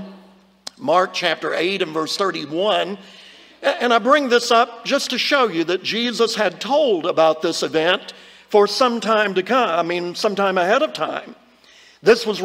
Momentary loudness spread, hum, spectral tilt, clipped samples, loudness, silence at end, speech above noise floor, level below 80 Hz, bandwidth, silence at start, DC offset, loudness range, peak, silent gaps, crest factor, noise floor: 8 LU; none; -3.5 dB/octave; under 0.1%; -18 LUFS; 0 s; 31 dB; -70 dBFS; 16 kHz; 0 s; under 0.1%; 3 LU; -2 dBFS; none; 16 dB; -49 dBFS